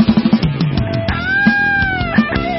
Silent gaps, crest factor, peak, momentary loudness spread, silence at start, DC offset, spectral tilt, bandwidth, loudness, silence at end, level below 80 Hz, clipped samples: none; 14 dB; -2 dBFS; 6 LU; 0 s; under 0.1%; -10 dB/octave; 5.8 kHz; -14 LUFS; 0 s; -30 dBFS; under 0.1%